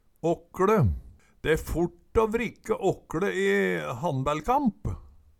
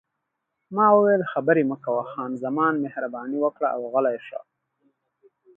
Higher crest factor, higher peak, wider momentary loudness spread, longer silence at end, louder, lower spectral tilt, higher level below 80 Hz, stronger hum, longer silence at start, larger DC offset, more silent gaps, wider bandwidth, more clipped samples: about the same, 18 dB vs 20 dB; second, -10 dBFS vs -4 dBFS; second, 7 LU vs 13 LU; second, 0.35 s vs 1.2 s; second, -27 LUFS vs -23 LUFS; second, -6.5 dB/octave vs -9.5 dB/octave; first, -42 dBFS vs -78 dBFS; neither; second, 0.25 s vs 0.7 s; neither; neither; first, 18 kHz vs 3.6 kHz; neither